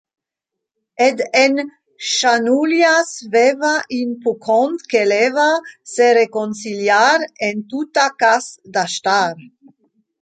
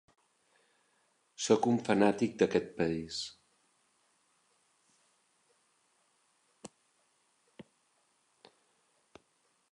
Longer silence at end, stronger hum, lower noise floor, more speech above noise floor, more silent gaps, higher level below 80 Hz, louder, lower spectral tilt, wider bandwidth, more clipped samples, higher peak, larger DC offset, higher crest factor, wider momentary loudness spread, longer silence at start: second, 0.75 s vs 3.05 s; neither; first, -82 dBFS vs -75 dBFS; first, 66 dB vs 45 dB; neither; about the same, -72 dBFS vs -70 dBFS; first, -16 LUFS vs -31 LUFS; second, -2.5 dB/octave vs -5 dB/octave; second, 9.4 kHz vs 11 kHz; neither; first, -2 dBFS vs -12 dBFS; neither; second, 16 dB vs 26 dB; second, 10 LU vs 26 LU; second, 1 s vs 1.4 s